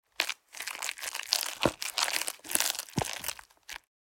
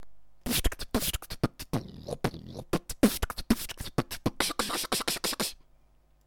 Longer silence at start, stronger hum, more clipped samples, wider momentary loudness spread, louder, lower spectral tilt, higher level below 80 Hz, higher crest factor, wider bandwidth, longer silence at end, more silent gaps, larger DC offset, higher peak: first, 0.2 s vs 0 s; neither; neither; first, 17 LU vs 9 LU; about the same, -31 LUFS vs -31 LUFS; second, -1.5 dB/octave vs -3.5 dB/octave; second, -60 dBFS vs -42 dBFS; first, 34 dB vs 26 dB; about the same, 17 kHz vs 18 kHz; second, 0.35 s vs 0.7 s; neither; neither; first, -2 dBFS vs -6 dBFS